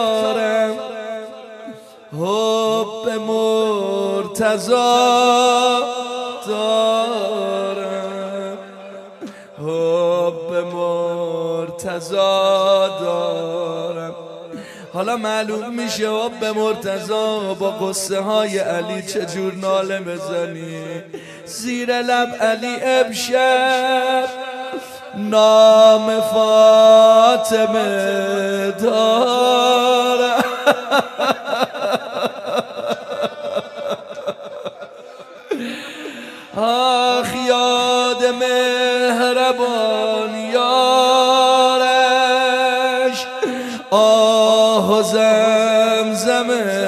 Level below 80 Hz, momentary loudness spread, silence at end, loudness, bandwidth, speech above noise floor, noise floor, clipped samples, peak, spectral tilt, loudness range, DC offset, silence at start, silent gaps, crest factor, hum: -68 dBFS; 16 LU; 0 s; -16 LUFS; 14 kHz; 22 dB; -38 dBFS; under 0.1%; 0 dBFS; -3 dB/octave; 10 LU; under 0.1%; 0 s; none; 16 dB; none